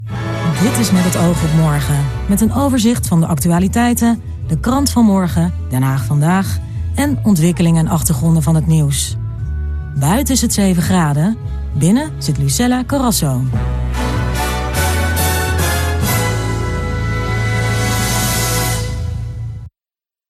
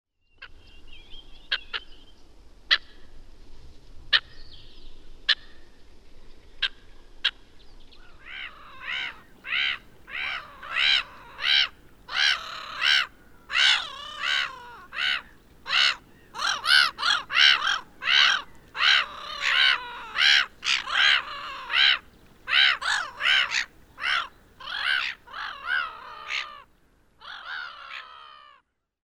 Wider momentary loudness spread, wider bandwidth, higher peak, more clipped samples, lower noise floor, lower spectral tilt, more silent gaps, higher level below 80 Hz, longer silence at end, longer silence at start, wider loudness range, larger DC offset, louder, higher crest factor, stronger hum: second, 8 LU vs 19 LU; second, 14 kHz vs 17 kHz; first, 0 dBFS vs -4 dBFS; neither; first, under -90 dBFS vs -63 dBFS; first, -5.5 dB/octave vs 1.5 dB/octave; neither; first, -26 dBFS vs -52 dBFS; about the same, 0.6 s vs 0.7 s; second, 0 s vs 0.4 s; second, 3 LU vs 11 LU; neither; first, -15 LUFS vs -23 LUFS; second, 14 dB vs 24 dB; neither